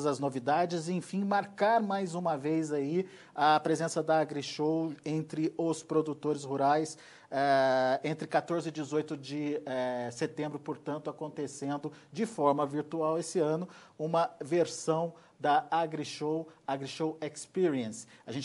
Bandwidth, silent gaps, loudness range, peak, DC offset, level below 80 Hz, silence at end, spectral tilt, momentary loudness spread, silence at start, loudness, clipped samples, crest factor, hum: 11.5 kHz; none; 4 LU; -14 dBFS; under 0.1%; -80 dBFS; 0 s; -5.5 dB/octave; 10 LU; 0 s; -32 LUFS; under 0.1%; 18 dB; none